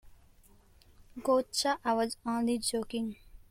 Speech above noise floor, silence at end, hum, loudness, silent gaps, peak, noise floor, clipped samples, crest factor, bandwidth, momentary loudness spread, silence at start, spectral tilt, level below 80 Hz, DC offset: 29 dB; 0.15 s; none; -32 LUFS; none; -16 dBFS; -60 dBFS; under 0.1%; 18 dB; 16 kHz; 10 LU; 0.05 s; -3 dB/octave; -60 dBFS; under 0.1%